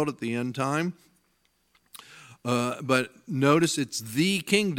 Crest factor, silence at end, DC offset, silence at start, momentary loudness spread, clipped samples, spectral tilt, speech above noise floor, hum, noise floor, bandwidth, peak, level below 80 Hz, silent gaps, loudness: 22 dB; 0 s; under 0.1%; 0 s; 11 LU; under 0.1%; -4.5 dB/octave; 44 dB; none; -70 dBFS; 17.5 kHz; -6 dBFS; -72 dBFS; none; -26 LUFS